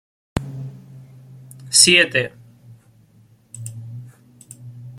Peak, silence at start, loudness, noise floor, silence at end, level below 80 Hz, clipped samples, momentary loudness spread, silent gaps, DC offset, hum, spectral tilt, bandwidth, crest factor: 0 dBFS; 0.35 s; -15 LUFS; -53 dBFS; 0 s; -50 dBFS; under 0.1%; 27 LU; none; under 0.1%; none; -1.5 dB/octave; 16.5 kHz; 24 dB